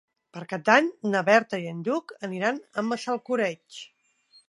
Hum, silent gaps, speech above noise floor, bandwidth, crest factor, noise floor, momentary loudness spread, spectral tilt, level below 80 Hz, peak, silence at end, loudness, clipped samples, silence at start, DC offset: none; none; 35 dB; 11.5 kHz; 24 dB; -61 dBFS; 20 LU; -5 dB/octave; -80 dBFS; -4 dBFS; 0.6 s; -25 LUFS; under 0.1%; 0.35 s; under 0.1%